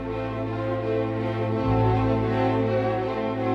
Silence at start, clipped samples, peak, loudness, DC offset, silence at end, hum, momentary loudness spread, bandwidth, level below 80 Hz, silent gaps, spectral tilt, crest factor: 0 s; under 0.1%; -10 dBFS; -25 LUFS; under 0.1%; 0 s; none; 6 LU; 6.2 kHz; -40 dBFS; none; -9 dB/octave; 14 dB